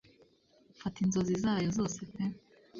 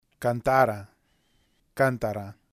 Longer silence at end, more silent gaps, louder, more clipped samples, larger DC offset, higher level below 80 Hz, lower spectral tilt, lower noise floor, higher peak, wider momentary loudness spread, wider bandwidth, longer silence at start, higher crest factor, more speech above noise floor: second, 0 s vs 0.2 s; neither; second, -34 LUFS vs -26 LUFS; neither; neither; second, -60 dBFS vs -54 dBFS; about the same, -6 dB/octave vs -6.5 dB/octave; about the same, -66 dBFS vs -67 dBFS; second, -20 dBFS vs -6 dBFS; second, 11 LU vs 16 LU; second, 7.6 kHz vs 15.5 kHz; first, 0.8 s vs 0.2 s; second, 14 dB vs 20 dB; second, 33 dB vs 42 dB